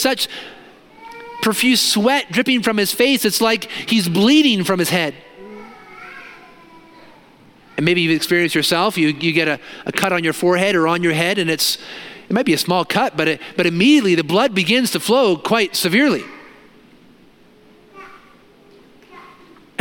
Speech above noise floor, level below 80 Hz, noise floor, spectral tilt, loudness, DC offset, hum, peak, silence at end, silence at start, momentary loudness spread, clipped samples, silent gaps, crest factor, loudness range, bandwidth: 32 dB; -62 dBFS; -49 dBFS; -4 dB/octave; -16 LUFS; under 0.1%; none; 0 dBFS; 0.6 s; 0 s; 19 LU; under 0.1%; none; 18 dB; 7 LU; 17.5 kHz